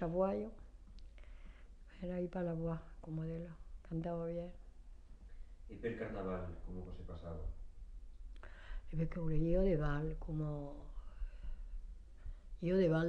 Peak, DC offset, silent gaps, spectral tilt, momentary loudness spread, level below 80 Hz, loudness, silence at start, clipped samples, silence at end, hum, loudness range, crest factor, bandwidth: -22 dBFS; under 0.1%; none; -9.5 dB/octave; 24 LU; -48 dBFS; -41 LUFS; 0 s; under 0.1%; 0 s; none; 7 LU; 18 dB; 6.6 kHz